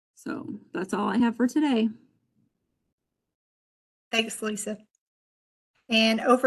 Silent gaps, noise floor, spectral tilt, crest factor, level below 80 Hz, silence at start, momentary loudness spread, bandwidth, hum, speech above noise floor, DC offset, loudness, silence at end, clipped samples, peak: 2.92-2.98 s, 3.35-4.11 s, 4.98-5.74 s; -75 dBFS; -4 dB/octave; 22 dB; -72 dBFS; 0.25 s; 15 LU; 12.5 kHz; none; 50 dB; under 0.1%; -26 LUFS; 0 s; under 0.1%; -6 dBFS